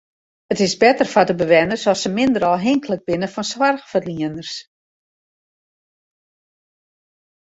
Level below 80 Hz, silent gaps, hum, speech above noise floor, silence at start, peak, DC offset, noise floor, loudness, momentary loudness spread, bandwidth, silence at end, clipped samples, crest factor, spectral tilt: -56 dBFS; none; none; over 72 dB; 0.5 s; -2 dBFS; under 0.1%; under -90 dBFS; -18 LUFS; 11 LU; 8 kHz; 2.9 s; under 0.1%; 18 dB; -4.5 dB/octave